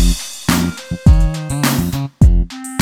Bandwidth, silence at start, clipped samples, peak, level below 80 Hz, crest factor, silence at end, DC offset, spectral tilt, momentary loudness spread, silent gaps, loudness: 18 kHz; 0 s; under 0.1%; 0 dBFS; -16 dBFS; 14 dB; 0 s; under 0.1%; -5.5 dB/octave; 8 LU; none; -16 LUFS